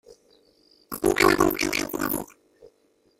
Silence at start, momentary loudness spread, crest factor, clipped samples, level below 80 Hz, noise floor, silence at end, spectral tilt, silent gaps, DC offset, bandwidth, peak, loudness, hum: 0.1 s; 15 LU; 22 dB; under 0.1%; -48 dBFS; -65 dBFS; 0.95 s; -3.5 dB/octave; none; under 0.1%; 16.5 kHz; -4 dBFS; -23 LUFS; none